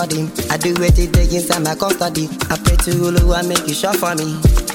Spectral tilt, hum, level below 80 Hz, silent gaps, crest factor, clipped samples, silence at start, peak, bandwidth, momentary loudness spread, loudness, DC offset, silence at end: -4.5 dB/octave; none; -20 dBFS; none; 14 dB; under 0.1%; 0 s; 0 dBFS; 18.5 kHz; 5 LU; -16 LUFS; under 0.1%; 0 s